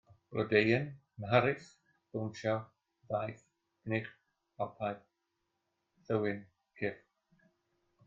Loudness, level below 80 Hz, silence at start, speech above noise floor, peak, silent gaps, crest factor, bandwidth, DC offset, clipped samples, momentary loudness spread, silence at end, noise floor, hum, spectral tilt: -35 LUFS; -72 dBFS; 0.3 s; 50 dB; -12 dBFS; none; 24 dB; 7.6 kHz; under 0.1%; under 0.1%; 17 LU; 1.1 s; -84 dBFS; none; -7 dB/octave